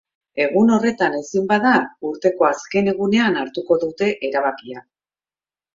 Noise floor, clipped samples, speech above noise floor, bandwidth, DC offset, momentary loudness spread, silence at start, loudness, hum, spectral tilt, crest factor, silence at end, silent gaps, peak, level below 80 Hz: under -90 dBFS; under 0.1%; over 72 dB; 7.6 kHz; under 0.1%; 9 LU; 0.35 s; -19 LUFS; none; -5.5 dB/octave; 18 dB; 0.95 s; none; -2 dBFS; -62 dBFS